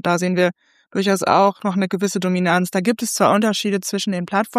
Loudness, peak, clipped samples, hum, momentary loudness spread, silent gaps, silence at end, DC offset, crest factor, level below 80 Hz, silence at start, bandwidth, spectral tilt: -19 LUFS; -2 dBFS; under 0.1%; none; 6 LU; none; 0 s; under 0.1%; 18 dB; -68 dBFS; 0.05 s; 15.5 kHz; -4.5 dB/octave